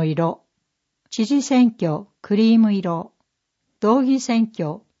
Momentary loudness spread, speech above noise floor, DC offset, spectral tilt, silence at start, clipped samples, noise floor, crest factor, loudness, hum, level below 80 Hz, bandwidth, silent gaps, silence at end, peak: 13 LU; 57 dB; under 0.1%; -6.5 dB/octave; 0 s; under 0.1%; -76 dBFS; 16 dB; -20 LUFS; none; -70 dBFS; 8 kHz; none; 0.2 s; -4 dBFS